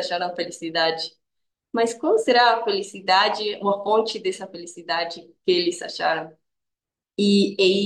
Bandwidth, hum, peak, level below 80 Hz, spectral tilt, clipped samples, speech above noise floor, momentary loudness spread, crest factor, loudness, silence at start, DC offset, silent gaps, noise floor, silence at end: 12 kHz; none; -4 dBFS; -76 dBFS; -4 dB/octave; under 0.1%; 64 dB; 13 LU; 18 dB; -22 LUFS; 0 s; under 0.1%; none; -86 dBFS; 0 s